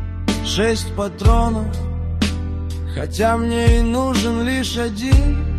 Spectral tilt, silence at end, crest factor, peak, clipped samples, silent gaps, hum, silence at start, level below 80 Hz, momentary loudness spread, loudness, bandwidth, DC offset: -5.5 dB/octave; 0 s; 16 dB; -2 dBFS; under 0.1%; none; none; 0 s; -22 dBFS; 9 LU; -19 LUFS; 14 kHz; under 0.1%